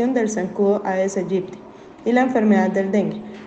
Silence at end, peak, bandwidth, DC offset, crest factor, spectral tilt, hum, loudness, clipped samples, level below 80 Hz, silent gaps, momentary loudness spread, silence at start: 0 s; -4 dBFS; 8.4 kHz; under 0.1%; 16 dB; -6.5 dB/octave; none; -20 LUFS; under 0.1%; -62 dBFS; none; 10 LU; 0 s